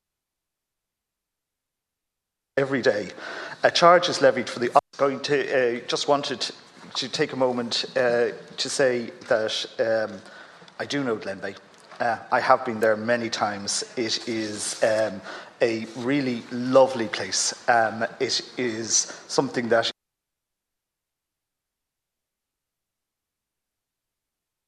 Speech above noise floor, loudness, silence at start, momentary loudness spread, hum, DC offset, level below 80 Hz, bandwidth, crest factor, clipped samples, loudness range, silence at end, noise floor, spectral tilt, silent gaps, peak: 62 dB; -24 LUFS; 2.55 s; 10 LU; none; under 0.1%; -74 dBFS; 12 kHz; 24 dB; under 0.1%; 6 LU; 4.75 s; -85 dBFS; -3 dB/octave; none; -2 dBFS